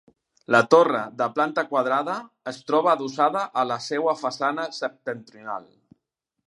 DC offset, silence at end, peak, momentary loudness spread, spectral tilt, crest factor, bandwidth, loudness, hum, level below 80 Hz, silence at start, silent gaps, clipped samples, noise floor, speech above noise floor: under 0.1%; 0.85 s; -2 dBFS; 17 LU; -4.5 dB/octave; 22 dB; 11.5 kHz; -23 LUFS; none; -76 dBFS; 0.5 s; none; under 0.1%; -81 dBFS; 58 dB